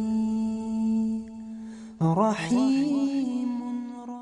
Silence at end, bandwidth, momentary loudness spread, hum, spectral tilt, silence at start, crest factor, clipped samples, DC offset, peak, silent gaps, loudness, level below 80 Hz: 0 s; 10.5 kHz; 16 LU; none; -7 dB/octave; 0 s; 16 dB; under 0.1%; under 0.1%; -10 dBFS; none; -26 LUFS; -60 dBFS